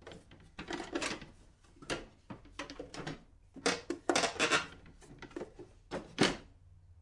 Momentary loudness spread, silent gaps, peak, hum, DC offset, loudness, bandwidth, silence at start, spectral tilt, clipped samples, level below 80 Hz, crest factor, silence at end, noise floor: 23 LU; none; -14 dBFS; none; under 0.1%; -36 LUFS; 11.5 kHz; 0 s; -3 dB/octave; under 0.1%; -60 dBFS; 24 dB; 0 s; -60 dBFS